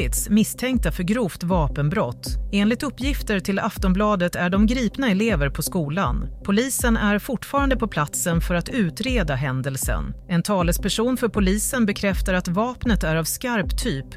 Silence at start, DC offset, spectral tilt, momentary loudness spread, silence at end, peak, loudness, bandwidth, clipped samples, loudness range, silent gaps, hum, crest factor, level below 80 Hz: 0 s; under 0.1%; -5 dB/octave; 5 LU; 0 s; -8 dBFS; -22 LUFS; 16 kHz; under 0.1%; 2 LU; none; none; 14 dB; -30 dBFS